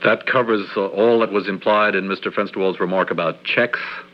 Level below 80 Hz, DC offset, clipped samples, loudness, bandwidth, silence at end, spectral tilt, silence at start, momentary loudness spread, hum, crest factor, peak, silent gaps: -70 dBFS; under 0.1%; under 0.1%; -19 LUFS; 6 kHz; 0.1 s; -7.5 dB/octave; 0 s; 6 LU; none; 16 dB; -2 dBFS; none